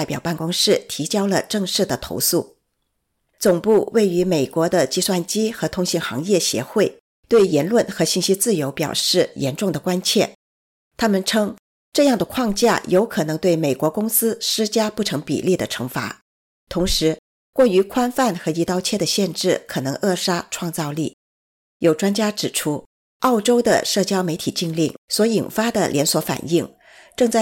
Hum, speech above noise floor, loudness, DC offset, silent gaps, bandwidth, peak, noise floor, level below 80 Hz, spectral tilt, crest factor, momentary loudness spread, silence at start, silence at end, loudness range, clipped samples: none; 53 dB; -20 LUFS; under 0.1%; 7.00-7.23 s, 10.35-10.91 s, 11.59-11.92 s, 16.22-16.67 s, 17.19-17.53 s, 21.13-21.80 s, 22.86-23.20 s, 24.98-25.08 s; 17 kHz; -4 dBFS; -73 dBFS; -46 dBFS; -4 dB/octave; 16 dB; 7 LU; 0 s; 0 s; 3 LU; under 0.1%